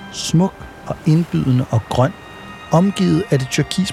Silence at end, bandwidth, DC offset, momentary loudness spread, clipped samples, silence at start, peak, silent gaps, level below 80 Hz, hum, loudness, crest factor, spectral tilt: 0 s; 13.5 kHz; under 0.1%; 16 LU; under 0.1%; 0 s; -2 dBFS; none; -44 dBFS; none; -17 LUFS; 14 dB; -6 dB/octave